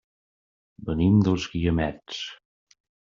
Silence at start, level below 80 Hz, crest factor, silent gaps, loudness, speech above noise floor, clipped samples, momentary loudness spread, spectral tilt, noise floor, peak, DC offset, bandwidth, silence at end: 0.8 s; -46 dBFS; 18 dB; none; -24 LUFS; over 67 dB; under 0.1%; 15 LU; -7 dB/octave; under -90 dBFS; -10 dBFS; under 0.1%; 7.4 kHz; 0.8 s